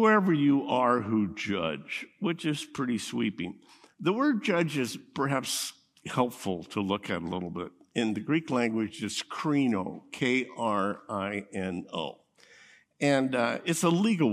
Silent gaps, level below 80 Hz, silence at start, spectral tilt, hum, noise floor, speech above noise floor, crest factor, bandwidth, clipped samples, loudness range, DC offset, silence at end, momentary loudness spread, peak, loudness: none; -72 dBFS; 0 s; -5 dB/octave; none; -57 dBFS; 29 dB; 18 dB; 15.5 kHz; under 0.1%; 3 LU; under 0.1%; 0 s; 10 LU; -10 dBFS; -29 LUFS